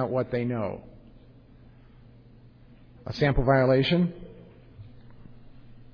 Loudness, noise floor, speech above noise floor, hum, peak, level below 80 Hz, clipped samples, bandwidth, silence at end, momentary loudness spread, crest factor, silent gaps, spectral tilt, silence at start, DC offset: -25 LUFS; -52 dBFS; 28 dB; none; -10 dBFS; -42 dBFS; under 0.1%; 5.4 kHz; 0.2 s; 23 LU; 20 dB; none; -8.5 dB/octave; 0 s; under 0.1%